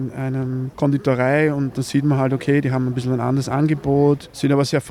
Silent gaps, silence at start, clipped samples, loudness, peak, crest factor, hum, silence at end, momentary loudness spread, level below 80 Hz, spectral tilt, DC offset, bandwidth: none; 0 s; under 0.1%; -19 LUFS; -6 dBFS; 12 dB; none; 0 s; 6 LU; -50 dBFS; -7 dB/octave; under 0.1%; 13.5 kHz